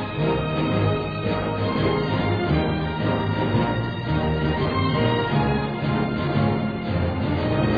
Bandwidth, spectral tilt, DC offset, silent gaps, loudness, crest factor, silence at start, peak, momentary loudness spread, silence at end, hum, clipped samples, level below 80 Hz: 5 kHz; -9.5 dB/octave; 0.2%; none; -23 LUFS; 14 dB; 0 s; -8 dBFS; 3 LU; 0 s; none; under 0.1%; -38 dBFS